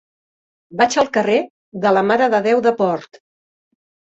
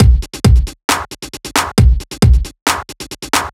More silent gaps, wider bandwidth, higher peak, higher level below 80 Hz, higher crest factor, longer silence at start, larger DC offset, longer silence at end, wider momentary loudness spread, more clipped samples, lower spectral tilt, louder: first, 1.50-1.72 s vs 0.84-0.88 s, 2.62-2.66 s; second, 8.2 kHz vs 16 kHz; about the same, -2 dBFS vs 0 dBFS; second, -62 dBFS vs -16 dBFS; about the same, 16 dB vs 12 dB; first, 0.7 s vs 0 s; neither; first, 1 s vs 0.05 s; second, 9 LU vs 14 LU; neither; about the same, -4.5 dB/octave vs -4.5 dB/octave; second, -17 LUFS vs -14 LUFS